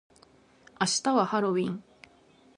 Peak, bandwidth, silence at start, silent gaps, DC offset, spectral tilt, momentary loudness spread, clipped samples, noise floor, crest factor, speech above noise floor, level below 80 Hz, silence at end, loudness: -10 dBFS; 11.5 kHz; 0.8 s; none; under 0.1%; -4 dB/octave; 9 LU; under 0.1%; -59 dBFS; 20 dB; 33 dB; -74 dBFS; 0.75 s; -27 LUFS